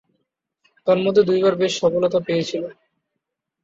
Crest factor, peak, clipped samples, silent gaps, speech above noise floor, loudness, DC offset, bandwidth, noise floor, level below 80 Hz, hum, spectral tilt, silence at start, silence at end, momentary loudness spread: 18 dB; -4 dBFS; under 0.1%; none; 62 dB; -19 LUFS; under 0.1%; 7.8 kHz; -80 dBFS; -62 dBFS; none; -5.5 dB/octave; 0.85 s; 0.9 s; 11 LU